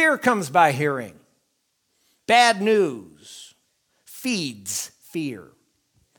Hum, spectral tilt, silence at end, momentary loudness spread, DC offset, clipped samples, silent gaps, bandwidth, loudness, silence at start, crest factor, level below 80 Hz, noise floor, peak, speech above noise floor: none; -3.5 dB/octave; 0.75 s; 25 LU; under 0.1%; under 0.1%; none; 19.5 kHz; -21 LUFS; 0 s; 22 dB; -70 dBFS; -72 dBFS; 0 dBFS; 51 dB